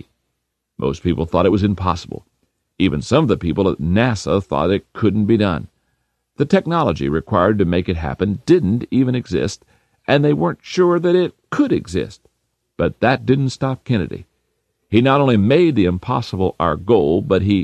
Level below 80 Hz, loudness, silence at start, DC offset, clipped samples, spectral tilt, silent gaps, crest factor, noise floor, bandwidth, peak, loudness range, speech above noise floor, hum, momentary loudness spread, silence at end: -36 dBFS; -17 LUFS; 0.8 s; under 0.1%; under 0.1%; -7 dB/octave; none; 18 dB; -74 dBFS; 9.8 kHz; 0 dBFS; 2 LU; 58 dB; none; 9 LU; 0 s